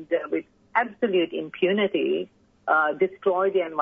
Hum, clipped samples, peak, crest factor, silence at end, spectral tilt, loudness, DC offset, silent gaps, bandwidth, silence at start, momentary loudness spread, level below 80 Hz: none; under 0.1%; -8 dBFS; 18 dB; 0 s; -8 dB/octave; -24 LUFS; under 0.1%; none; 3.8 kHz; 0 s; 8 LU; -70 dBFS